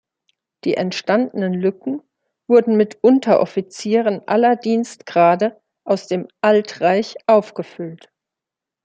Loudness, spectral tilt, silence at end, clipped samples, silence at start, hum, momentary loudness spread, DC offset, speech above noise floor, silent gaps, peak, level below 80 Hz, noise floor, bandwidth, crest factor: -18 LUFS; -6 dB/octave; 0.9 s; under 0.1%; 0.65 s; none; 13 LU; under 0.1%; 69 dB; none; -2 dBFS; -70 dBFS; -86 dBFS; 9.2 kHz; 16 dB